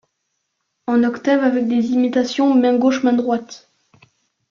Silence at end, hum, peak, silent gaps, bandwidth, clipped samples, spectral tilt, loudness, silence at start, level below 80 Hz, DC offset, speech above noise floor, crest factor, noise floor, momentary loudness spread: 0.95 s; none; -4 dBFS; none; 7.2 kHz; under 0.1%; -5 dB/octave; -17 LUFS; 0.9 s; -64 dBFS; under 0.1%; 57 dB; 14 dB; -73 dBFS; 8 LU